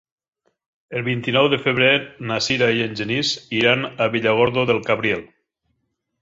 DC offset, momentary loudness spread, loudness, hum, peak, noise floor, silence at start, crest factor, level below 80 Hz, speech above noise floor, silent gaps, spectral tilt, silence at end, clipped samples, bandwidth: under 0.1%; 7 LU; -19 LUFS; none; -2 dBFS; -74 dBFS; 0.9 s; 20 dB; -56 dBFS; 54 dB; none; -4.5 dB/octave; 0.95 s; under 0.1%; 7.8 kHz